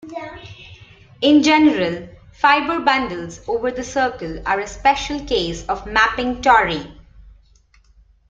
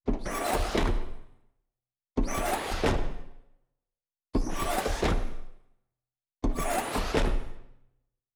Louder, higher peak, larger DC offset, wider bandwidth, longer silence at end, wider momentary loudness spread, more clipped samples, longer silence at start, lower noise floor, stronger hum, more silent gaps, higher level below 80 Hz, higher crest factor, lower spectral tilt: first, -18 LUFS vs -31 LUFS; first, 0 dBFS vs -14 dBFS; neither; second, 7.8 kHz vs over 20 kHz; first, 1.1 s vs 0.65 s; first, 17 LU vs 12 LU; neither; about the same, 0.05 s vs 0.05 s; second, -53 dBFS vs under -90 dBFS; neither; neither; second, -42 dBFS vs -34 dBFS; about the same, 20 dB vs 16 dB; about the same, -4 dB/octave vs -4.5 dB/octave